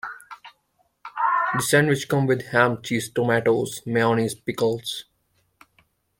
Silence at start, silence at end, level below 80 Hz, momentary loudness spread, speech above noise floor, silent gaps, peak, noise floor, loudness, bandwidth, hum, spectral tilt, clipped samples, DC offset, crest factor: 0.05 s; 1.15 s; -60 dBFS; 16 LU; 46 dB; none; -2 dBFS; -68 dBFS; -22 LUFS; 16.5 kHz; none; -5 dB/octave; under 0.1%; under 0.1%; 22 dB